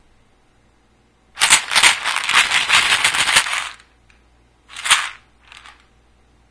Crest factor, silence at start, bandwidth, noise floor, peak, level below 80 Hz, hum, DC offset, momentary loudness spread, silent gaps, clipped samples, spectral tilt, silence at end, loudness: 20 dB; 1.35 s; 11 kHz; -56 dBFS; 0 dBFS; -54 dBFS; none; under 0.1%; 14 LU; none; under 0.1%; 2 dB/octave; 0.8 s; -14 LUFS